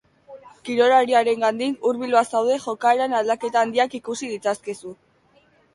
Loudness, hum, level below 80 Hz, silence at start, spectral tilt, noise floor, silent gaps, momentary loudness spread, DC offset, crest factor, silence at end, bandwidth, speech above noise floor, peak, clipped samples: -21 LUFS; none; -70 dBFS; 0.3 s; -3.5 dB/octave; -59 dBFS; none; 13 LU; under 0.1%; 18 dB; 0.8 s; 11.5 kHz; 38 dB; -4 dBFS; under 0.1%